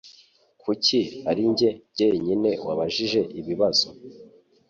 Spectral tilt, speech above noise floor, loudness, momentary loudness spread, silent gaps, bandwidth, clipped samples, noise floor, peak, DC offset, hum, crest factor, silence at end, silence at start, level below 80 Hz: -4.5 dB/octave; 33 dB; -23 LUFS; 7 LU; none; 7.8 kHz; under 0.1%; -57 dBFS; -8 dBFS; under 0.1%; none; 18 dB; 0.45 s; 0.05 s; -60 dBFS